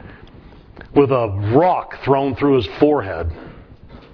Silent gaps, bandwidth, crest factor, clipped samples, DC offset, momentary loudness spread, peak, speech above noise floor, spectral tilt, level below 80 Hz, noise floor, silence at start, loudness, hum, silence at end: none; 5.4 kHz; 18 dB; under 0.1%; under 0.1%; 11 LU; 0 dBFS; 26 dB; -9.5 dB/octave; -40 dBFS; -42 dBFS; 0.05 s; -17 LUFS; none; 0.15 s